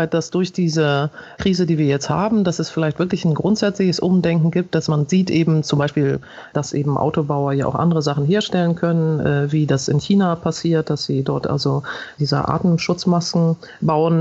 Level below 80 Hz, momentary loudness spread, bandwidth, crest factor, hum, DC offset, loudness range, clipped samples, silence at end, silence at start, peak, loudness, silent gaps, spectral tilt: -50 dBFS; 5 LU; 8 kHz; 14 dB; none; under 0.1%; 1 LU; under 0.1%; 0 s; 0 s; -4 dBFS; -19 LUFS; none; -6.5 dB/octave